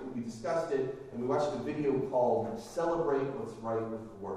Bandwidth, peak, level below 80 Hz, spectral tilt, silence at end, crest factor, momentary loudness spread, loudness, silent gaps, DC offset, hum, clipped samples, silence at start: 13 kHz; -18 dBFS; -62 dBFS; -7 dB/octave; 0 s; 16 dB; 9 LU; -33 LUFS; none; under 0.1%; none; under 0.1%; 0 s